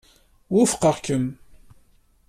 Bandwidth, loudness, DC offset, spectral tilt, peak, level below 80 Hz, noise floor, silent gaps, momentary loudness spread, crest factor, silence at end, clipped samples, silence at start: 14.5 kHz; -22 LUFS; under 0.1%; -5 dB/octave; -6 dBFS; -54 dBFS; -57 dBFS; none; 7 LU; 18 dB; 0.95 s; under 0.1%; 0.5 s